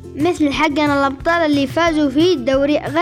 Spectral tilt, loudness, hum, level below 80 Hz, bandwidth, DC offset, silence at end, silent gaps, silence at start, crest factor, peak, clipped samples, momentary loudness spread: -5.5 dB/octave; -16 LUFS; none; -40 dBFS; 14.5 kHz; under 0.1%; 0 s; none; 0 s; 10 dB; -4 dBFS; under 0.1%; 2 LU